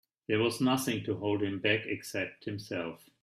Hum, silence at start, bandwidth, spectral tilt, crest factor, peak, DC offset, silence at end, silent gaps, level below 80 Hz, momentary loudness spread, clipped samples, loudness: none; 0.3 s; 16 kHz; -5 dB/octave; 20 dB; -12 dBFS; under 0.1%; 0.3 s; none; -70 dBFS; 9 LU; under 0.1%; -32 LUFS